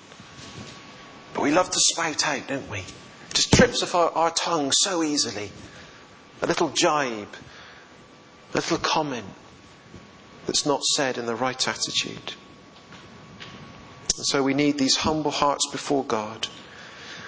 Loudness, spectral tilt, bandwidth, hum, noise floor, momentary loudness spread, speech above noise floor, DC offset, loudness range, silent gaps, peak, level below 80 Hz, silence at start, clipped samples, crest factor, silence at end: -23 LUFS; -2.5 dB/octave; 8 kHz; none; -49 dBFS; 23 LU; 25 dB; under 0.1%; 6 LU; none; -2 dBFS; -50 dBFS; 0 s; under 0.1%; 24 dB; 0 s